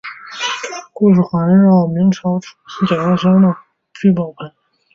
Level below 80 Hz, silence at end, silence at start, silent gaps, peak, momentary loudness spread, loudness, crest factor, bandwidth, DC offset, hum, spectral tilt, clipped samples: -54 dBFS; 0.45 s; 0.05 s; none; -2 dBFS; 17 LU; -14 LUFS; 12 dB; 7.4 kHz; under 0.1%; none; -7 dB/octave; under 0.1%